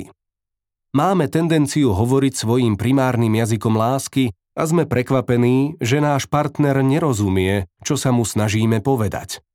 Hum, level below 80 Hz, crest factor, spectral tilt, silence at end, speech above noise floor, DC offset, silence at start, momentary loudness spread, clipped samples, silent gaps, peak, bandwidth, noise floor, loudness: none; -50 dBFS; 14 dB; -6 dB/octave; 0.15 s; 65 dB; under 0.1%; 0 s; 4 LU; under 0.1%; none; -4 dBFS; 16.5 kHz; -83 dBFS; -18 LUFS